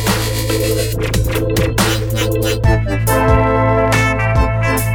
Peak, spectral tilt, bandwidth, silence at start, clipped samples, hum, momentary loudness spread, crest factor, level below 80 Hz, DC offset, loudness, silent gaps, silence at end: 0 dBFS; -5 dB/octave; over 20 kHz; 0 s; under 0.1%; none; 4 LU; 14 dB; -22 dBFS; under 0.1%; -15 LUFS; none; 0 s